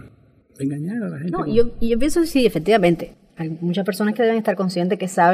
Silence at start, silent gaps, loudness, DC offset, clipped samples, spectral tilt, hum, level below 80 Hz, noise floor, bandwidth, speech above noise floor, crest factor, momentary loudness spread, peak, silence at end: 0.05 s; none; -20 LUFS; under 0.1%; under 0.1%; -6 dB/octave; none; -38 dBFS; -52 dBFS; 15.5 kHz; 33 dB; 16 dB; 10 LU; -4 dBFS; 0 s